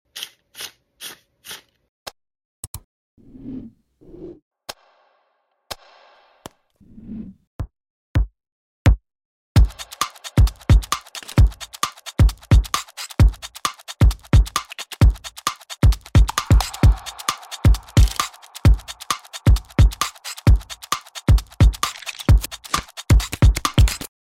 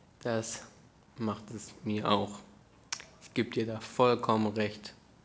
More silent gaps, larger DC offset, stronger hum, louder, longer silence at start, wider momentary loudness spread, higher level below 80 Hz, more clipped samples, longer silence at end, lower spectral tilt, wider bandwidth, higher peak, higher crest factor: first, 1.89-2.06 s, 2.45-2.74 s, 2.84-3.17 s, 4.42-4.51 s, 7.47-7.59 s, 7.90-8.15 s, 8.52-8.85 s, 9.25-9.55 s vs none; neither; neither; first, -20 LUFS vs -33 LUFS; about the same, 0.15 s vs 0.25 s; first, 20 LU vs 14 LU; first, -22 dBFS vs -66 dBFS; neither; about the same, 0.25 s vs 0.3 s; about the same, -5 dB/octave vs -5 dB/octave; first, 16 kHz vs 8 kHz; first, -2 dBFS vs -12 dBFS; about the same, 18 dB vs 22 dB